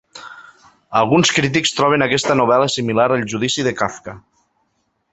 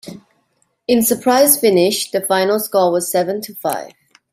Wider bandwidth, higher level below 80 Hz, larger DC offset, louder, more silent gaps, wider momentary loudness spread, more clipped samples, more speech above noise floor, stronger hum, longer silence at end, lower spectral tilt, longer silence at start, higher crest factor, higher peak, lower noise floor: second, 8.4 kHz vs 16 kHz; first, -54 dBFS vs -62 dBFS; neither; about the same, -16 LUFS vs -15 LUFS; neither; first, 21 LU vs 11 LU; neither; about the same, 51 dB vs 49 dB; neither; first, 0.95 s vs 0.45 s; about the same, -4 dB/octave vs -3 dB/octave; about the same, 0.15 s vs 0.05 s; about the same, 18 dB vs 16 dB; about the same, 0 dBFS vs 0 dBFS; about the same, -67 dBFS vs -64 dBFS